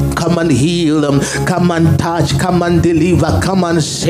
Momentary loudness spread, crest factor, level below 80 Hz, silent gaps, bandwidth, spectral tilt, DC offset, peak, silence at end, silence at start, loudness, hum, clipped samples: 3 LU; 12 dB; -32 dBFS; none; 15.5 kHz; -6 dB/octave; under 0.1%; 0 dBFS; 0 s; 0 s; -13 LUFS; none; under 0.1%